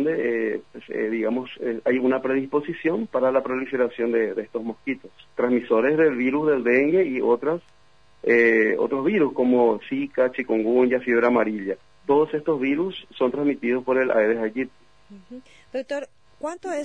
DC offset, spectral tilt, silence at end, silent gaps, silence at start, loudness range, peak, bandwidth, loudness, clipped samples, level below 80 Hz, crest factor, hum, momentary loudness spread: 0.2%; -7 dB/octave; 0 s; none; 0 s; 4 LU; -6 dBFS; 8.6 kHz; -23 LUFS; under 0.1%; -66 dBFS; 16 dB; none; 12 LU